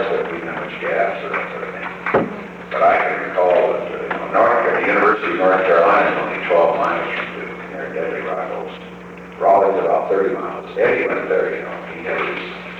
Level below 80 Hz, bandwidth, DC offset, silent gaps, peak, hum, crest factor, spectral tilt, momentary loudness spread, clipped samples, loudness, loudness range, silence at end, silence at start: -54 dBFS; 8 kHz; under 0.1%; none; -2 dBFS; none; 16 dB; -6.5 dB/octave; 13 LU; under 0.1%; -18 LUFS; 5 LU; 0 s; 0 s